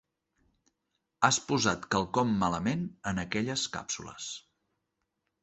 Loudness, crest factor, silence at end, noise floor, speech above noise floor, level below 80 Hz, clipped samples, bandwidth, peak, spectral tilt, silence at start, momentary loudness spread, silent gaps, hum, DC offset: -30 LUFS; 26 dB; 1.05 s; -82 dBFS; 52 dB; -58 dBFS; under 0.1%; 8.4 kHz; -8 dBFS; -3.5 dB/octave; 1.2 s; 12 LU; none; none; under 0.1%